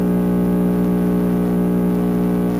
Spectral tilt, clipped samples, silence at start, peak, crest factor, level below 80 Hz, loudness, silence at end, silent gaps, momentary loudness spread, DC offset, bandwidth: -9 dB/octave; under 0.1%; 0 s; -8 dBFS; 10 dB; -36 dBFS; -18 LUFS; 0 s; none; 1 LU; under 0.1%; 15.5 kHz